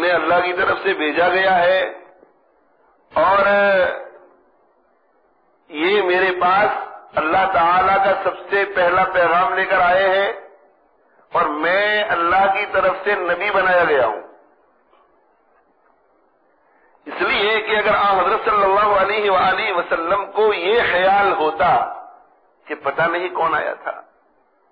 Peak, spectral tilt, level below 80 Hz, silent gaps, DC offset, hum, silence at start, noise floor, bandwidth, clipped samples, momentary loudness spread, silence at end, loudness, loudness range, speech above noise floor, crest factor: -6 dBFS; -6.5 dB/octave; -52 dBFS; none; under 0.1%; none; 0 s; -60 dBFS; 5.2 kHz; under 0.1%; 10 LU; 0.7 s; -17 LUFS; 5 LU; 43 dB; 12 dB